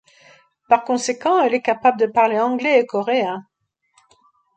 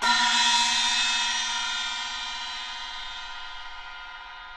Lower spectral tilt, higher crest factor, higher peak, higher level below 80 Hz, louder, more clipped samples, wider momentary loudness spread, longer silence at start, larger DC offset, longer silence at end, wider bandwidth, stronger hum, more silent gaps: first, -3.5 dB/octave vs 2 dB/octave; about the same, 18 dB vs 18 dB; first, -2 dBFS vs -10 dBFS; second, -68 dBFS vs -52 dBFS; first, -18 LUFS vs -24 LUFS; neither; second, 4 LU vs 19 LU; first, 0.7 s vs 0 s; neither; first, 1.15 s vs 0 s; second, 9.2 kHz vs 13 kHz; neither; neither